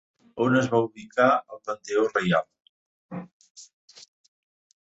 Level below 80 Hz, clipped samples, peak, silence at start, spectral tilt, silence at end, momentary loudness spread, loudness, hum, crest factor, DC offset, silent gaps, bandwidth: -68 dBFS; under 0.1%; -6 dBFS; 0.35 s; -6 dB/octave; 1.2 s; 19 LU; -24 LUFS; none; 22 dB; under 0.1%; 2.69-3.09 s, 3.33-3.40 s, 3.50-3.55 s; 8 kHz